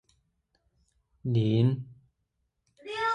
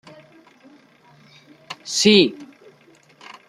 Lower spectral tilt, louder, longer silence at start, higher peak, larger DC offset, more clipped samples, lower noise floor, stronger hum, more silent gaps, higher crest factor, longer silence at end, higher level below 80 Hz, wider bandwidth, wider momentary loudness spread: first, -8 dB/octave vs -3.5 dB/octave; second, -28 LUFS vs -16 LUFS; second, 1.25 s vs 1.7 s; second, -14 dBFS vs -2 dBFS; neither; neither; first, -79 dBFS vs -53 dBFS; neither; neither; about the same, 18 dB vs 22 dB; second, 0 s vs 1.05 s; about the same, -62 dBFS vs -66 dBFS; second, 9 kHz vs 13.5 kHz; second, 21 LU vs 25 LU